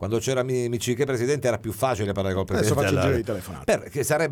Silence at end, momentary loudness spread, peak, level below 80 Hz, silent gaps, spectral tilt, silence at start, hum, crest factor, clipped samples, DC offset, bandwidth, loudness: 0 s; 5 LU; -8 dBFS; -48 dBFS; none; -5.5 dB/octave; 0 s; none; 16 dB; under 0.1%; under 0.1%; 19 kHz; -24 LUFS